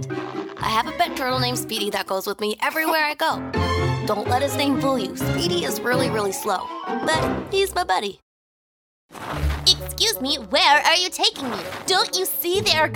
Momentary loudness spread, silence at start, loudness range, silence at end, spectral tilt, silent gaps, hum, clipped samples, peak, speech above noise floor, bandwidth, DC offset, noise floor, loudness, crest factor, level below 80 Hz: 9 LU; 0 s; 5 LU; 0 s; -3.5 dB/octave; 8.22-9.09 s; none; under 0.1%; -2 dBFS; over 68 dB; over 20 kHz; under 0.1%; under -90 dBFS; -21 LUFS; 20 dB; -42 dBFS